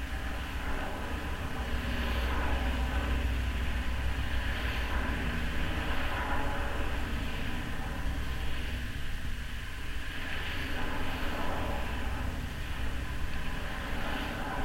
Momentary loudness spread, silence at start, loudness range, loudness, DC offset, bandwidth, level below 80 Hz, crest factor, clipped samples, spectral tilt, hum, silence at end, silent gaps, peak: 5 LU; 0 s; 4 LU; -35 LUFS; under 0.1%; 16 kHz; -36 dBFS; 14 dB; under 0.1%; -5 dB/octave; none; 0 s; none; -18 dBFS